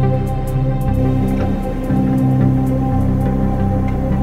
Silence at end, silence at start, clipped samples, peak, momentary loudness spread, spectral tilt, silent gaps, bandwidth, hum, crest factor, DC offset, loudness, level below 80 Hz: 0 s; 0 s; under 0.1%; -4 dBFS; 4 LU; -9.5 dB/octave; none; 13.5 kHz; none; 12 dB; under 0.1%; -17 LUFS; -22 dBFS